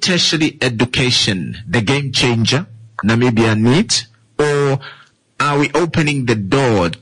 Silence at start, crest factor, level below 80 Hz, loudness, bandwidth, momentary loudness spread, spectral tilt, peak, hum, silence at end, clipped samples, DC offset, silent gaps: 0 s; 12 dB; -44 dBFS; -15 LUFS; 11 kHz; 6 LU; -4.5 dB/octave; -4 dBFS; none; 0.05 s; under 0.1%; under 0.1%; none